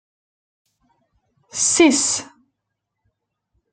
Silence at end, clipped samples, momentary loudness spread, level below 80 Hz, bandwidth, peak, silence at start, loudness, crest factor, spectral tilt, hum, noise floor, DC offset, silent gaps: 1.5 s; under 0.1%; 12 LU; -64 dBFS; 9.6 kHz; -2 dBFS; 1.55 s; -16 LUFS; 22 dB; -1 dB/octave; none; -79 dBFS; under 0.1%; none